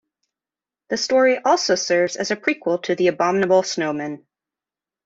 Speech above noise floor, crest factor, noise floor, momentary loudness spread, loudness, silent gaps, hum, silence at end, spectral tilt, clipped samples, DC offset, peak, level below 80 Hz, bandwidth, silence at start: over 71 dB; 16 dB; under -90 dBFS; 10 LU; -20 LUFS; none; none; 0.9 s; -3.5 dB/octave; under 0.1%; under 0.1%; -4 dBFS; -66 dBFS; 8 kHz; 0.9 s